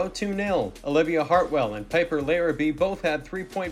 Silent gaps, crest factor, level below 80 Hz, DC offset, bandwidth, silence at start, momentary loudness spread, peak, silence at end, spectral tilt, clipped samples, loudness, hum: none; 16 dB; -48 dBFS; under 0.1%; 14.5 kHz; 0 s; 6 LU; -8 dBFS; 0 s; -5.5 dB/octave; under 0.1%; -25 LUFS; none